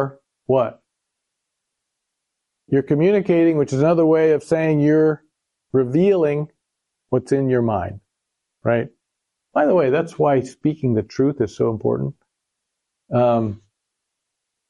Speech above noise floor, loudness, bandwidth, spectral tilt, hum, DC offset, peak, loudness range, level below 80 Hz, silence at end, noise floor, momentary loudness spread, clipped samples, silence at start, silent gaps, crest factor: 62 dB; -19 LUFS; 11 kHz; -8.5 dB/octave; none; under 0.1%; -4 dBFS; 6 LU; -58 dBFS; 1.15 s; -80 dBFS; 10 LU; under 0.1%; 0 s; none; 16 dB